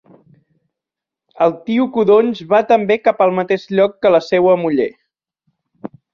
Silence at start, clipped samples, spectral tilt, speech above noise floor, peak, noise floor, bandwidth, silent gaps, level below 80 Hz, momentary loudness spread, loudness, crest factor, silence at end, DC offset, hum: 1.4 s; under 0.1%; -7 dB/octave; 71 dB; -2 dBFS; -85 dBFS; 7 kHz; none; -62 dBFS; 7 LU; -15 LUFS; 14 dB; 0.25 s; under 0.1%; none